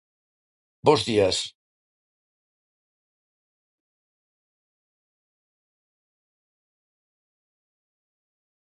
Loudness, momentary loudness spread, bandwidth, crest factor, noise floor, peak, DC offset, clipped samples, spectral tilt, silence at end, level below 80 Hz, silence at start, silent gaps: -22 LUFS; 9 LU; 11 kHz; 28 dB; under -90 dBFS; -4 dBFS; under 0.1%; under 0.1%; -4 dB/octave; 7.2 s; -60 dBFS; 0.85 s; none